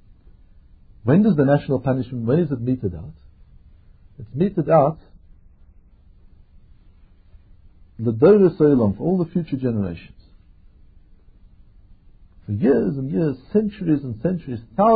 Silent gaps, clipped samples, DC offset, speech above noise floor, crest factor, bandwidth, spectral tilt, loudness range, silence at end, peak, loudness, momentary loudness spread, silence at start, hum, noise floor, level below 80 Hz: none; under 0.1%; under 0.1%; 31 dB; 18 dB; 4.8 kHz; -13.5 dB/octave; 8 LU; 0 s; -4 dBFS; -20 LUFS; 14 LU; 1.05 s; none; -50 dBFS; -48 dBFS